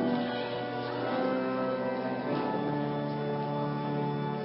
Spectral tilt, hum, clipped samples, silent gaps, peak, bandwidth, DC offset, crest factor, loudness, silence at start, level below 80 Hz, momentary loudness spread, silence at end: -5.5 dB/octave; none; under 0.1%; none; -18 dBFS; 5.6 kHz; under 0.1%; 14 dB; -32 LUFS; 0 s; -68 dBFS; 3 LU; 0 s